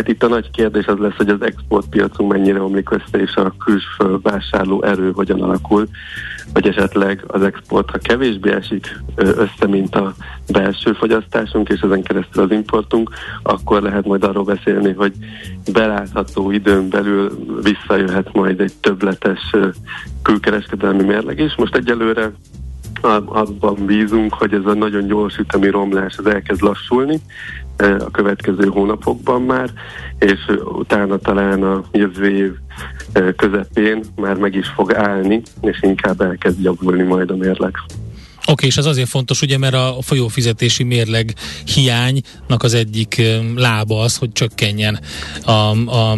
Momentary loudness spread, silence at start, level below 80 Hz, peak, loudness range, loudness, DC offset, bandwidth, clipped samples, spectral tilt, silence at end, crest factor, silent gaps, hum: 6 LU; 0 s; -36 dBFS; -2 dBFS; 1 LU; -16 LUFS; under 0.1%; 12 kHz; under 0.1%; -5.5 dB/octave; 0 s; 14 dB; none; none